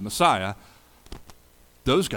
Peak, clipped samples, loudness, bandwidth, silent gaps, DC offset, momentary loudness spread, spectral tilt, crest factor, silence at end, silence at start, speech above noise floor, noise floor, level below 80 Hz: -6 dBFS; under 0.1%; -24 LUFS; 19 kHz; none; under 0.1%; 25 LU; -4 dB/octave; 20 dB; 0 s; 0 s; 32 dB; -55 dBFS; -48 dBFS